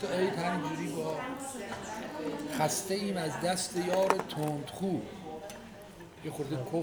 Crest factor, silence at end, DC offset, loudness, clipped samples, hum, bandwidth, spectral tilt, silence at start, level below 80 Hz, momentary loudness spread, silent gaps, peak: 26 dB; 0 s; under 0.1%; -34 LUFS; under 0.1%; none; over 20 kHz; -4.5 dB/octave; 0 s; -64 dBFS; 14 LU; none; -8 dBFS